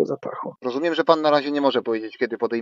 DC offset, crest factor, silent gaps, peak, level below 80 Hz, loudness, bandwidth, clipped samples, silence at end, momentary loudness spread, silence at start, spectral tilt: under 0.1%; 20 dB; none; -2 dBFS; -76 dBFS; -22 LUFS; 7.4 kHz; under 0.1%; 0 s; 11 LU; 0 s; -6 dB/octave